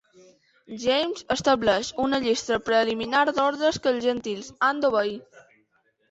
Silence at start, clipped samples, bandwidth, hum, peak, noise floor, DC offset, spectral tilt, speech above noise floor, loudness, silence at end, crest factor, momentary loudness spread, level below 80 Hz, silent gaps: 0.7 s; under 0.1%; 8.2 kHz; none; -8 dBFS; -68 dBFS; under 0.1%; -3.5 dB/octave; 44 dB; -24 LUFS; 0.9 s; 16 dB; 8 LU; -58 dBFS; none